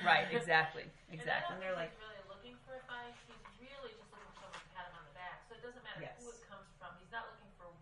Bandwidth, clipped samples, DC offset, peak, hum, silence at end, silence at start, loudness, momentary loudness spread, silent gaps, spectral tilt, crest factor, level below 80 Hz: 11 kHz; under 0.1%; under 0.1%; -14 dBFS; none; 0 s; 0 s; -39 LUFS; 24 LU; none; -4 dB/octave; 26 dB; -68 dBFS